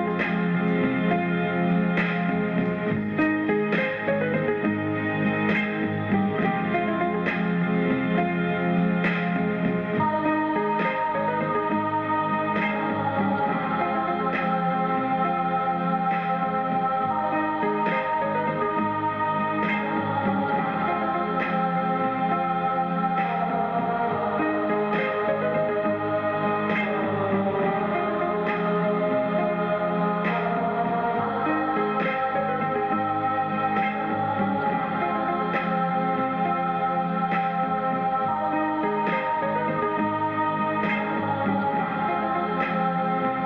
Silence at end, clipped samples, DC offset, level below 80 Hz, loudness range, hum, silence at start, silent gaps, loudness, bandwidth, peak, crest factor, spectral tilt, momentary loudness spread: 0 s; under 0.1%; under 0.1%; -60 dBFS; 1 LU; none; 0 s; none; -24 LUFS; 5.4 kHz; -14 dBFS; 10 dB; -9 dB/octave; 2 LU